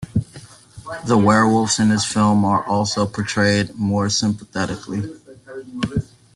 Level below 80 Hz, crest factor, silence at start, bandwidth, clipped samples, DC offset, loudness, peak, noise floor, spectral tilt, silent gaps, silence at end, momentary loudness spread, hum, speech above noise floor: -48 dBFS; 18 dB; 0 s; 11.5 kHz; under 0.1%; under 0.1%; -19 LUFS; -2 dBFS; -42 dBFS; -5 dB/octave; none; 0.3 s; 18 LU; none; 24 dB